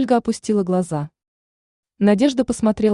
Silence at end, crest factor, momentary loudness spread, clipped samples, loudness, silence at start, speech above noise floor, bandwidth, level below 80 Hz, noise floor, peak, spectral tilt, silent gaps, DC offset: 0 s; 14 dB; 10 LU; under 0.1%; -19 LUFS; 0 s; over 72 dB; 11 kHz; -52 dBFS; under -90 dBFS; -4 dBFS; -6.5 dB/octave; 1.28-1.83 s; under 0.1%